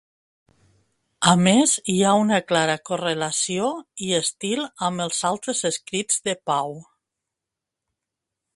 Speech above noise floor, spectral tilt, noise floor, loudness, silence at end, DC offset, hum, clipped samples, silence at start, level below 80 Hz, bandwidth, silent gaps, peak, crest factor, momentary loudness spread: 64 dB; -3.5 dB/octave; -85 dBFS; -21 LUFS; 1.75 s; under 0.1%; none; under 0.1%; 1.2 s; -64 dBFS; 11.5 kHz; none; 0 dBFS; 22 dB; 9 LU